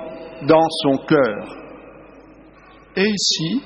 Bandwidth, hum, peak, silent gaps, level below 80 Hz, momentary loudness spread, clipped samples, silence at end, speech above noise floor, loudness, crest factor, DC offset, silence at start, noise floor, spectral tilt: 8.4 kHz; none; -2 dBFS; none; -54 dBFS; 20 LU; under 0.1%; 0 s; 28 dB; -18 LUFS; 18 dB; under 0.1%; 0 s; -46 dBFS; -4 dB/octave